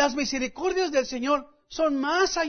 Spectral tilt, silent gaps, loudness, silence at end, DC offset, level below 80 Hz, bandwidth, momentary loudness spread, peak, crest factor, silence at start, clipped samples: -2 dB/octave; none; -26 LUFS; 0 s; under 0.1%; -54 dBFS; 6.6 kHz; 4 LU; -10 dBFS; 16 dB; 0 s; under 0.1%